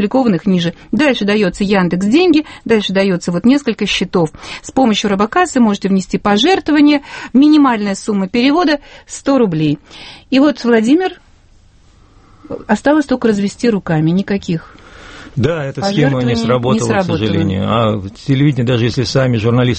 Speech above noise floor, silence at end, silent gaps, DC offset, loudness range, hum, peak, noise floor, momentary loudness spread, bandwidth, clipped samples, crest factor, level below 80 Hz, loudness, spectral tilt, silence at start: 33 dB; 0 s; none; under 0.1%; 4 LU; none; 0 dBFS; -46 dBFS; 7 LU; 8.8 kHz; under 0.1%; 14 dB; -42 dBFS; -14 LUFS; -6 dB/octave; 0 s